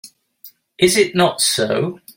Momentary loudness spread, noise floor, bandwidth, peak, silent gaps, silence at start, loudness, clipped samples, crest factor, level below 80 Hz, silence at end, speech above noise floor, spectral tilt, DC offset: 5 LU; -46 dBFS; 17 kHz; -2 dBFS; none; 0.05 s; -16 LUFS; under 0.1%; 18 dB; -56 dBFS; 0.2 s; 29 dB; -3 dB/octave; under 0.1%